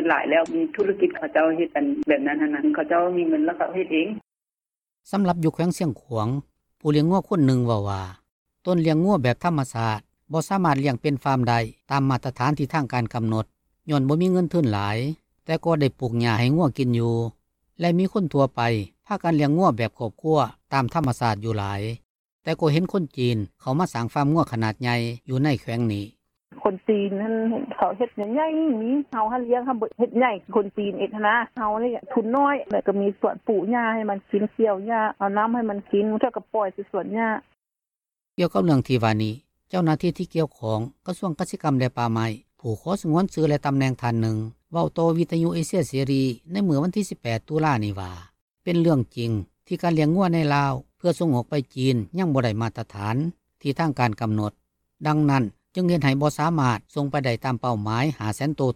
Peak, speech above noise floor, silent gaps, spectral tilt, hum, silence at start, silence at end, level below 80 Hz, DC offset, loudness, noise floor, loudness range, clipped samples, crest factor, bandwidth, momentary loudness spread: -4 dBFS; over 67 dB; 8.31-8.46 s, 22.05-22.39 s, 48.41-48.48 s; -7 dB/octave; none; 0 s; 0 s; -56 dBFS; under 0.1%; -24 LUFS; under -90 dBFS; 3 LU; under 0.1%; 18 dB; 15 kHz; 8 LU